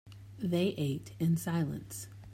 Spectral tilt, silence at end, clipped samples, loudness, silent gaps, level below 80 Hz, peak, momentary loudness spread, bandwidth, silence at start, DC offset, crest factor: -6.5 dB/octave; 0 s; under 0.1%; -34 LUFS; none; -62 dBFS; -18 dBFS; 13 LU; 16 kHz; 0.05 s; under 0.1%; 16 dB